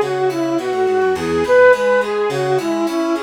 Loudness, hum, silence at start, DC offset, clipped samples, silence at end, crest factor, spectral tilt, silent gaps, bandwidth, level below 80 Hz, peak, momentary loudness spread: -16 LUFS; none; 0 s; under 0.1%; under 0.1%; 0 s; 14 dB; -5.5 dB/octave; none; 15.5 kHz; -50 dBFS; -2 dBFS; 7 LU